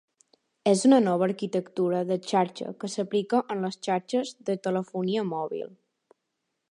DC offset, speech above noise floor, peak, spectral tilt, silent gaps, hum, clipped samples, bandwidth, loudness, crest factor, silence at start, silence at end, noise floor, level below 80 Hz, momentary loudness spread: under 0.1%; 55 dB; -8 dBFS; -5.5 dB/octave; none; none; under 0.1%; 11 kHz; -27 LUFS; 20 dB; 0.65 s; 1.05 s; -81 dBFS; -78 dBFS; 11 LU